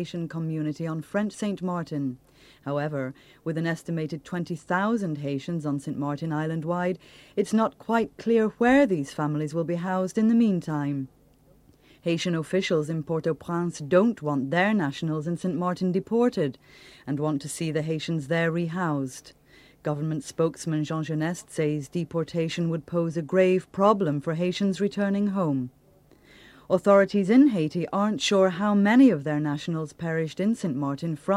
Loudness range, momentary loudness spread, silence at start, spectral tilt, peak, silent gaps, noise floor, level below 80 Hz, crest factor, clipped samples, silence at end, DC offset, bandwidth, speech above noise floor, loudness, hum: 7 LU; 11 LU; 0 s; -6.5 dB/octave; -6 dBFS; none; -58 dBFS; -62 dBFS; 20 dB; under 0.1%; 0 s; under 0.1%; 13.5 kHz; 33 dB; -26 LUFS; none